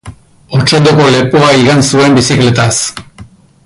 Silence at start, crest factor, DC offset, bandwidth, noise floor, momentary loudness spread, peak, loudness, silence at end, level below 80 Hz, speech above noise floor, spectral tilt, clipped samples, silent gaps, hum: 0.05 s; 8 dB; under 0.1%; 11.5 kHz; -35 dBFS; 8 LU; 0 dBFS; -8 LUFS; 0.4 s; -38 dBFS; 28 dB; -4.5 dB/octave; under 0.1%; none; none